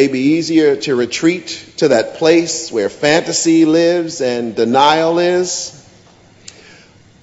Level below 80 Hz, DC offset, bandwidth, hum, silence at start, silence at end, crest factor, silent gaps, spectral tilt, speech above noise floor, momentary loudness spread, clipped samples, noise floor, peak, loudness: -58 dBFS; under 0.1%; 8 kHz; none; 0 s; 1.45 s; 14 dB; none; -4 dB/octave; 32 dB; 8 LU; under 0.1%; -45 dBFS; 0 dBFS; -14 LUFS